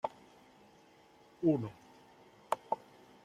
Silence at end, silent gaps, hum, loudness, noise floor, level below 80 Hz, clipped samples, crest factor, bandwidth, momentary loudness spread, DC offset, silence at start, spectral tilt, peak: 0.5 s; none; none; -37 LUFS; -63 dBFS; -78 dBFS; under 0.1%; 24 dB; 13.5 kHz; 27 LU; under 0.1%; 0.05 s; -7.5 dB/octave; -16 dBFS